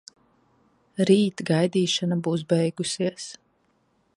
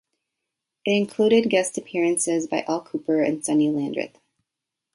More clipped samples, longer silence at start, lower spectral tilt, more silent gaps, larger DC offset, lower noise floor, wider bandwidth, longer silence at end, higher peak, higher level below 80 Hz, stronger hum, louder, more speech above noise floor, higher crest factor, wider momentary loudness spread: neither; first, 1 s vs 0.85 s; first, -5.5 dB/octave vs -4 dB/octave; neither; neither; second, -67 dBFS vs -85 dBFS; about the same, 11.5 kHz vs 11.5 kHz; about the same, 0.85 s vs 0.85 s; about the same, -6 dBFS vs -6 dBFS; about the same, -68 dBFS vs -70 dBFS; neither; about the same, -24 LUFS vs -23 LUFS; second, 44 dB vs 63 dB; about the same, 20 dB vs 18 dB; first, 12 LU vs 9 LU